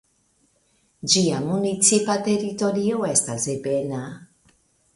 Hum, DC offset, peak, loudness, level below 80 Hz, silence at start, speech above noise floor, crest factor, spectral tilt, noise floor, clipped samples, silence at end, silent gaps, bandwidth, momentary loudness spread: none; under 0.1%; -4 dBFS; -21 LUFS; -62 dBFS; 1.05 s; 43 dB; 20 dB; -3.5 dB/octave; -65 dBFS; under 0.1%; 0.7 s; none; 11.5 kHz; 12 LU